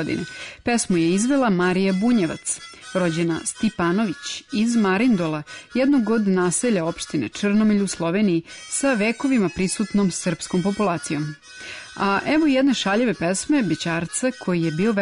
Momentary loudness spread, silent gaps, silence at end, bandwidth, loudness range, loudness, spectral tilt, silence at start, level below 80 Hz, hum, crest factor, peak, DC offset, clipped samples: 9 LU; none; 0 s; 11 kHz; 2 LU; -21 LUFS; -5 dB/octave; 0 s; -54 dBFS; none; 10 dB; -10 dBFS; under 0.1%; under 0.1%